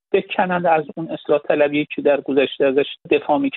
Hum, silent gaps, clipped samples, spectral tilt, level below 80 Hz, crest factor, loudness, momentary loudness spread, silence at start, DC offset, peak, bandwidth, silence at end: none; none; under 0.1%; -3.5 dB/octave; -64 dBFS; 18 dB; -19 LUFS; 4 LU; 0.15 s; under 0.1%; -2 dBFS; 4.2 kHz; 0 s